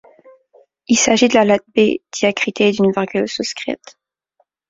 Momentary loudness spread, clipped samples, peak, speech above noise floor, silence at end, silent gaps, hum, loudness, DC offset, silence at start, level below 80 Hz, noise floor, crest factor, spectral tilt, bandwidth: 10 LU; under 0.1%; -2 dBFS; 49 dB; 0.95 s; none; none; -16 LUFS; under 0.1%; 0.9 s; -58 dBFS; -65 dBFS; 16 dB; -3.5 dB/octave; 7.8 kHz